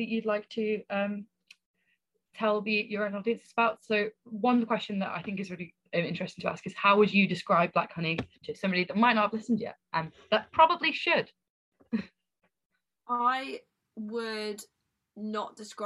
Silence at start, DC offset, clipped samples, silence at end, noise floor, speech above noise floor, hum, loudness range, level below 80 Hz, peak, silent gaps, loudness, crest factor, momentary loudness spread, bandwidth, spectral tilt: 0 s; under 0.1%; under 0.1%; 0 s; -78 dBFS; 49 dB; none; 8 LU; -70 dBFS; -8 dBFS; 1.66-1.74 s, 11.50-11.72 s, 12.65-12.70 s; -29 LUFS; 22 dB; 13 LU; 12 kHz; -6 dB/octave